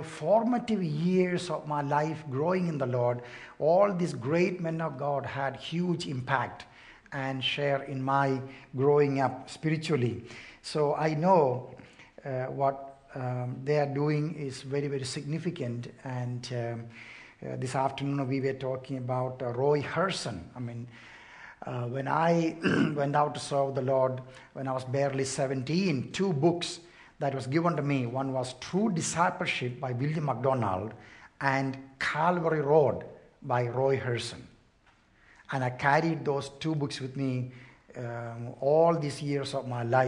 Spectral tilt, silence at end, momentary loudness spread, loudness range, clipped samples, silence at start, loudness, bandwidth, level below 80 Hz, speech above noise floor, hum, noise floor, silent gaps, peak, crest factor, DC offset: -6 dB/octave; 0 s; 14 LU; 4 LU; under 0.1%; 0 s; -30 LUFS; 11 kHz; -66 dBFS; 34 dB; none; -63 dBFS; none; -10 dBFS; 20 dB; under 0.1%